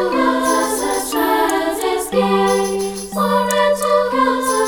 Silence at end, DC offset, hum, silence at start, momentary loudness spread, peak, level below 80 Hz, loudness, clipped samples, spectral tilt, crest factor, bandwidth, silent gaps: 0 s; under 0.1%; none; 0 s; 5 LU; -4 dBFS; -46 dBFS; -17 LUFS; under 0.1%; -3.5 dB/octave; 14 dB; over 20 kHz; none